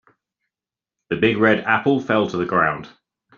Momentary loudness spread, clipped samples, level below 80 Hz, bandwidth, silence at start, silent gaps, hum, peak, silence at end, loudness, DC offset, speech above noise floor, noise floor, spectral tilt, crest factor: 6 LU; under 0.1%; -58 dBFS; 7.2 kHz; 1.1 s; none; none; -2 dBFS; 0.5 s; -19 LUFS; under 0.1%; 71 dB; -89 dBFS; -7 dB/octave; 20 dB